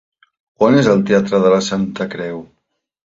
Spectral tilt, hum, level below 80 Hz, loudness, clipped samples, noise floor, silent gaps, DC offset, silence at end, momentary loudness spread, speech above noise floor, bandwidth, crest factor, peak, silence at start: -6 dB/octave; none; -54 dBFS; -15 LUFS; under 0.1%; -70 dBFS; none; under 0.1%; 0.6 s; 13 LU; 56 dB; 7.8 kHz; 14 dB; -2 dBFS; 0.6 s